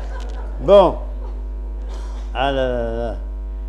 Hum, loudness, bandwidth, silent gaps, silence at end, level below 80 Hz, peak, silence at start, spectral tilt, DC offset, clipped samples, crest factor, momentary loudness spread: none; -18 LUFS; 8.6 kHz; none; 0 s; -26 dBFS; 0 dBFS; 0 s; -7 dB/octave; under 0.1%; under 0.1%; 20 dB; 18 LU